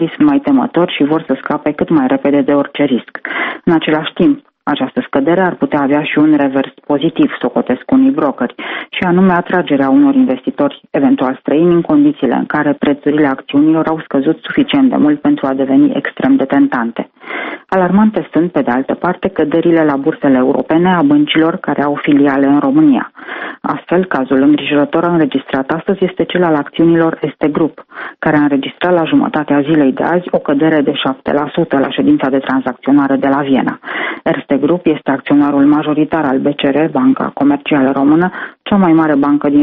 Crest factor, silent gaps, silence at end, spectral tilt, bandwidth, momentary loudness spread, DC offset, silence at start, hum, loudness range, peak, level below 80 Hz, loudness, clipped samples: 12 dB; none; 0 s; -5 dB/octave; 4 kHz; 7 LU; under 0.1%; 0 s; none; 2 LU; 0 dBFS; -50 dBFS; -12 LUFS; under 0.1%